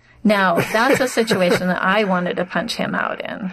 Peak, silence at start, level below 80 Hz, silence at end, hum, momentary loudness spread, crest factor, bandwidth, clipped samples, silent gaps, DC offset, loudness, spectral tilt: -6 dBFS; 0.25 s; -54 dBFS; 0 s; none; 6 LU; 12 dB; 14 kHz; under 0.1%; none; under 0.1%; -18 LUFS; -5 dB/octave